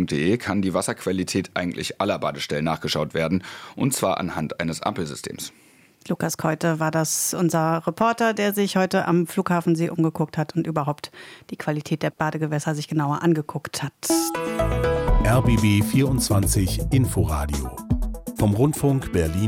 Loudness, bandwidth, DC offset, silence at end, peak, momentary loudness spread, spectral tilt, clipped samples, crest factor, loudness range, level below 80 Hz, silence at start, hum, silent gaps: -23 LUFS; 16.5 kHz; under 0.1%; 0 s; -6 dBFS; 8 LU; -5.5 dB/octave; under 0.1%; 16 dB; 5 LU; -34 dBFS; 0 s; none; none